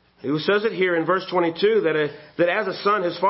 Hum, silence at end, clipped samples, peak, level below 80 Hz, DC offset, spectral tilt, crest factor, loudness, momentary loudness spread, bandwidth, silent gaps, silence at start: none; 0 s; under 0.1%; -6 dBFS; -68 dBFS; under 0.1%; -9.5 dB/octave; 14 dB; -21 LUFS; 5 LU; 5.8 kHz; none; 0.25 s